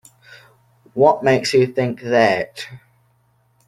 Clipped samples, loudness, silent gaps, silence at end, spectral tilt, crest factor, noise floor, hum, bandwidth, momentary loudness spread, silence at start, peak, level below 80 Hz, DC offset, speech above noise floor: under 0.1%; -17 LUFS; none; 0.9 s; -5.5 dB/octave; 18 dB; -60 dBFS; none; 13.5 kHz; 16 LU; 0.95 s; -2 dBFS; -60 dBFS; under 0.1%; 44 dB